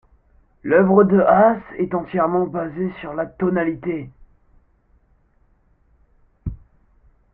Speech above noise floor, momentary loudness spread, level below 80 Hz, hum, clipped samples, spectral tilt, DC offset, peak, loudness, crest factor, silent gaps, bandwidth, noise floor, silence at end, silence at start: 41 dB; 20 LU; -48 dBFS; none; under 0.1%; -12.5 dB/octave; under 0.1%; -2 dBFS; -19 LUFS; 18 dB; none; 3.7 kHz; -59 dBFS; 0.8 s; 0.65 s